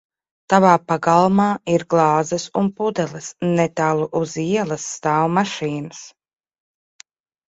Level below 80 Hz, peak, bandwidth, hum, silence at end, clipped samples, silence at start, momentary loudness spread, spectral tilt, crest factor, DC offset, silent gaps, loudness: -60 dBFS; 0 dBFS; 8 kHz; none; 1.4 s; under 0.1%; 0.5 s; 10 LU; -5.5 dB/octave; 20 dB; under 0.1%; none; -19 LUFS